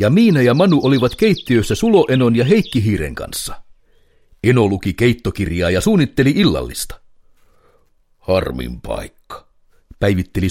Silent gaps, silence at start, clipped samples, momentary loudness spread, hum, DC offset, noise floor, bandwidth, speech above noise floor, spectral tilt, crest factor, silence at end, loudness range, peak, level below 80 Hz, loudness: none; 0 s; under 0.1%; 15 LU; none; under 0.1%; -55 dBFS; 16.5 kHz; 41 dB; -6 dB/octave; 16 dB; 0 s; 9 LU; 0 dBFS; -36 dBFS; -16 LUFS